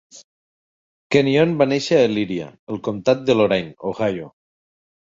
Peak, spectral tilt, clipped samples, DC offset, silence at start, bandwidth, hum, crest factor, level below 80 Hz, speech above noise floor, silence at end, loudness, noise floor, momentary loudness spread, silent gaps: -2 dBFS; -6 dB/octave; under 0.1%; under 0.1%; 0.15 s; 7.8 kHz; none; 18 dB; -58 dBFS; over 71 dB; 0.85 s; -19 LUFS; under -90 dBFS; 12 LU; 0.24-1.10 s, 2.59-2.67 s